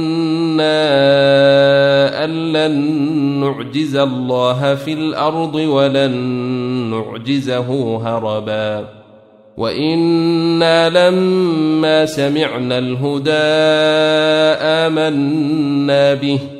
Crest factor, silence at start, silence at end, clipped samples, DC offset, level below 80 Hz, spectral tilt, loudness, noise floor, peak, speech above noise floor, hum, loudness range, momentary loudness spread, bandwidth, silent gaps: 14 dB; 0 s; 0 s; under 0.1%; under 0.1%; -56 dBFS; -6 dB/octave; -14 LUFS; -44 dBFS; -2 dBFS; 30 dB; none; 5 LU; 8 LU; 12 kHz; none